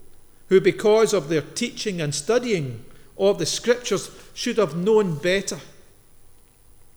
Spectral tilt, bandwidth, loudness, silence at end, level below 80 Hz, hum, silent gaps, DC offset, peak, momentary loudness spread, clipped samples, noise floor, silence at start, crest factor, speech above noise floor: -4.5 dB/octave; over 20 kHz; -22 LUFS; 1.15 s; -52 dBFS; none; none; under 0.1%; -4 dBFS; 11 LU; under 0.1%; -50 dBFS; 0 s; 18 dB; 28 dB